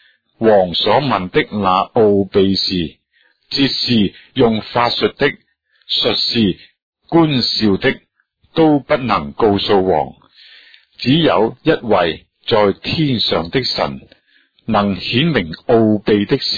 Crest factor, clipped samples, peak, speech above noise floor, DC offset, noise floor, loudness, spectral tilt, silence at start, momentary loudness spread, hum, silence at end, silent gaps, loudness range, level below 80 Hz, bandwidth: 16 dB; under 0.1%; 0 dBFS; 44 dB; under 0.1%; -59 dBFS; -15 LUFS; -6.5 dB/octave; 0.4 s; 6 LU; none; 0 s; 6.82-6.93 s; 2 LU; -44 dBFS; 5 kHz